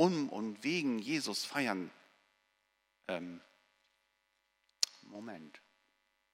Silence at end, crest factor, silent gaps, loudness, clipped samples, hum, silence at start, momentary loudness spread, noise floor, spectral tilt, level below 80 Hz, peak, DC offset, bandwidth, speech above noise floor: 0.75 s; 28 dB; none; -36 LUFS; under 0.1%; none; 0 s; 16 LU; -80 dBFS; -4 dB/octave; -88 dBFS; -12 dBFS; under 0.1%; 16 kHz; 43 dB